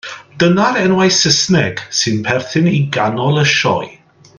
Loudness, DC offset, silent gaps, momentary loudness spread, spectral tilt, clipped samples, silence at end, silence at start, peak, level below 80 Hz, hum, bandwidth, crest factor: -13 LUFS; under 0.1%; none; 6 LU; -4 dB/octave; under 0.1%; 0.45 s; 0.05 s; 0 dBFS; -50 dBFS; none; 10.5 kHz; 14 dB